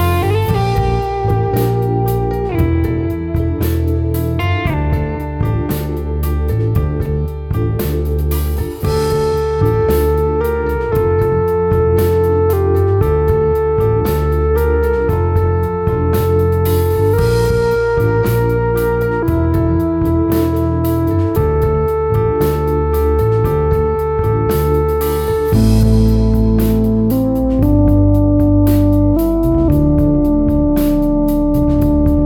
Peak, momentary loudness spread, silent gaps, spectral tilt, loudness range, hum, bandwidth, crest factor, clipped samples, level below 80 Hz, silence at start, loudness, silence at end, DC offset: -2 dBFS; 5 LU; none; -8.5 dB/octave; 5 LU; none; over 20 kHz; 12 dB; under 0.1%; -20 dBFS; 0 s; -15 LUFS; 0 s; under 0.1%